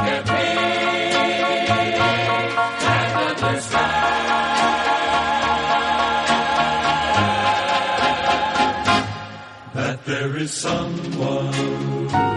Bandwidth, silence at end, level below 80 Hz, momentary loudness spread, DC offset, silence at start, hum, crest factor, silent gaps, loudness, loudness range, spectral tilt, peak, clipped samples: 11.5 kHz; 0 s; -48 dBFS; 6 LU; under 0.1%; 0 s; none; 16 dB; none; -19 LUFS; 4 LU; -4 dB/octave; -4 dBFS; under 0.1%